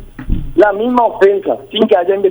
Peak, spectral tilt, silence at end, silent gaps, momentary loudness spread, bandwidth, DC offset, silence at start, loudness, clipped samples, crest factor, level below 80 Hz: 0 dBFS; -7 dB/octave; 0 s; none; 8 LU; over 20 kHz; under 0.1%; 0 s; -12 LUFS; under 0.1%; 12 dB; -26 dBFS